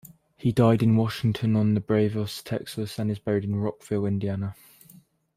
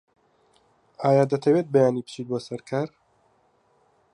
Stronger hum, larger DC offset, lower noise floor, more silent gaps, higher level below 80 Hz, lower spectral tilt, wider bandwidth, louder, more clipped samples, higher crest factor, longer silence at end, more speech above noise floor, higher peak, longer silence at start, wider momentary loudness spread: neither; neither; second, -55 dBFS vs -64 dBFS; neither; first, -58 dBFS vs -72 dBFS; about the same, -7.5 dB/octave vs -7.5 dB/octave; first, 15.5 kHz vs 11 kHz; about the same, -26 LUFS vs -24 LUFS; neither; about the same, 20 dB vs 18 dB; second, 0.85 s vs 1.25 s; second, 31 dB vs 42 dB; about the same, -6 dBFS vs -6 dBFS; second, 0.05 s vs 1 s; about the same, 11 LU vs 11 LU